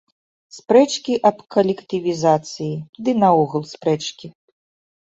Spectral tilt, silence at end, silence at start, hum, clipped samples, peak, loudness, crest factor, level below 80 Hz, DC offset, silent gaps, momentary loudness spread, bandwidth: -5.5 dB/octave; 0.75 s; 0.55 s; none; under 0.1%; -2 dBFS; -19 LUFS; 18 dB; -64 dBFS; under 0.1%; 2.89-2.93 s; 12 LU; 8 kHz